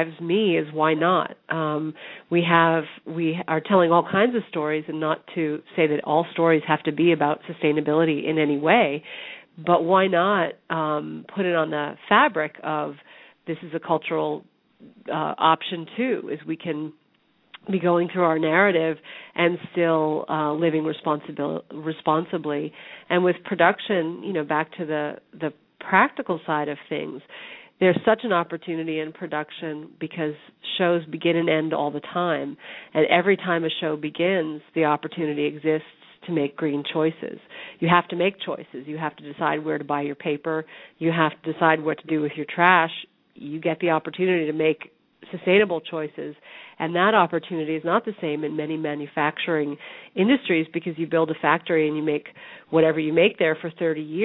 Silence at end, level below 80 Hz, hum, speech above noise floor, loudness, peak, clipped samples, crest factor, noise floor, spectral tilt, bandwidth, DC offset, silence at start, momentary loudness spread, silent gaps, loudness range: 0 s; -70 dBFS; none; 41 dB; -23 LUFS; 0 dBFS; under 0.1%; 22 dB; -64 dBFS; -9.5 dB/octave; 4.1 kHz; under 0.1%; 0 s; 14 LU; none; 4 LU